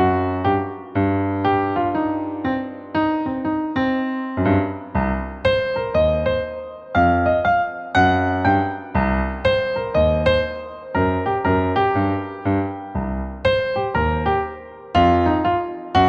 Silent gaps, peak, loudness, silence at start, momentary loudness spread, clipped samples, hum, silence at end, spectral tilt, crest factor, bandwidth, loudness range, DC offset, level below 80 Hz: none; -4 dBFS; -20 LUFS; 0 s; 7 LU; under 0.1%; none; 0 s; -8 dB/octave; 16 dB; 7.4 kHz; 3 LU; under 0.1%; -34 dBFS